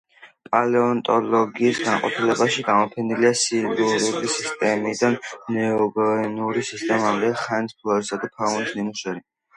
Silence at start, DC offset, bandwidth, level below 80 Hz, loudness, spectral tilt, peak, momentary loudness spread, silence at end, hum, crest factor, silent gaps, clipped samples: 0.2 s; under 0.1%; 11.5 kHz; -66 dBFS; -22 LUFS; -4 dB/octave; -4 dBFS; 6 LU; 0.4 s; none; 18 dB; none; under 0.1%